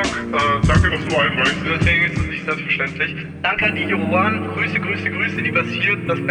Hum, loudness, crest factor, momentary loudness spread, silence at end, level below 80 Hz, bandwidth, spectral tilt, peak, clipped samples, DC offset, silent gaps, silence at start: none; -18 LUFS; 16 dB; 6 LU; 0 s; -34 dBFS; 10.5 kHz; -5.5 dB/octave; -2 dBFS; under 0.1%; under 0.1%; none; 0 s